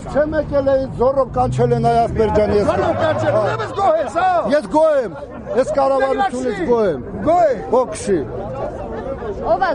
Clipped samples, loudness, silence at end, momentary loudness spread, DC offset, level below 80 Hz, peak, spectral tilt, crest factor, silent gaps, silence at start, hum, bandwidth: under 0.1%; -17 LUFS; 0 s; 11 LU; under 0.1%; -36 dBFS; -2 dBFS; -6.5 dB/octave; 14 dB; none; 0 s; none; 10.5 kHz